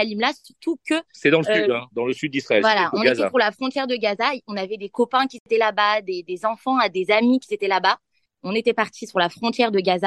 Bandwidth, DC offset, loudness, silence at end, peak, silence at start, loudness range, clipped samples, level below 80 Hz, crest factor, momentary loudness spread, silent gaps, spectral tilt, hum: 12 kHz; under 0.1%; -21 LUFS; 0 s; -2 dBFS; 0 s; 2 LU; under 0.1%; -72 dBFS; 18 dB; 9 LU; 5.40-5.46 s; -4.5 dB/octave; none